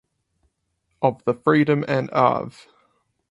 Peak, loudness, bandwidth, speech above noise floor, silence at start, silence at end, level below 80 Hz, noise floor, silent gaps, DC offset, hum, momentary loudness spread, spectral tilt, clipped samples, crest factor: -2 dBFS; -21 LUFS; 11 kHz; 52 dB; 1 s; 0.8 s; -64 dBFS; -73 dBFS; none; under 0.1%; none; 7 LU; -8 dB/octave; under 0.1%; 20 dB